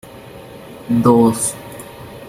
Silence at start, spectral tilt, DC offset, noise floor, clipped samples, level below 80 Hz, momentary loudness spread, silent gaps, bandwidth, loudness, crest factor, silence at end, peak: 0.15 s; -6 dB/octave; under 0.1%; -36 dBFS; under 0.1%; -50 dBFS; 24 LU; none; 16 kHz; -15 LUFS; 16 dB; 0 s; -2 dBFS